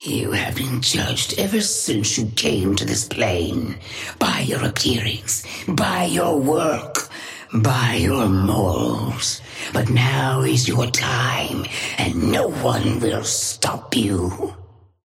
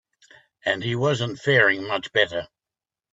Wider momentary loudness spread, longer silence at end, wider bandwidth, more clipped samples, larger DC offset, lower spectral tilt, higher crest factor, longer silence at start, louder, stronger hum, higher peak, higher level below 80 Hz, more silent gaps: about the same, 6 LU vs 8 LU; second, 0.4 s vs 0.7 s; first, 16.5 kHz vs 8 kHz; neither; neither; about the same, -4 dB/octave vs -5 dB/octave; about the same, 18 dB vs 20 dB; second, 0 s vs 0.65 s; about the same, -20 LUFS vs -22 LUFS; neither; about the same, -4 dBFS vs -4 dBFS; first, -44 dBFS vs -64 dBFS; neither